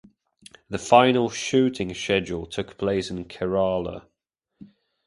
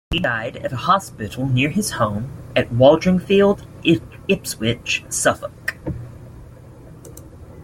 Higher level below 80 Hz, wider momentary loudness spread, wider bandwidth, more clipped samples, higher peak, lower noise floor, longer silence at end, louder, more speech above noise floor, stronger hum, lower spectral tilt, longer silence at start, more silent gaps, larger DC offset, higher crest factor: second, -52 dBFS vs -42 dBFS; about the same, 16 LU vs 18 LU; second, 11.5 kHz vs 16.5 kHz; neither; about the same, 0 dBFS vs -2 dBFS; first, -80 dBFS vs -41 dBFS; first, 0.4 s vs 0 s; second, -23 LUFS vs -19 LUFS; first, 57 dB vs 22 dB; neither; about the same, -5 dB/octave vs -5 dB/octave; first, 0.7 s vs 0.1 s; neither; neither; first, 24 dB vs 18 dB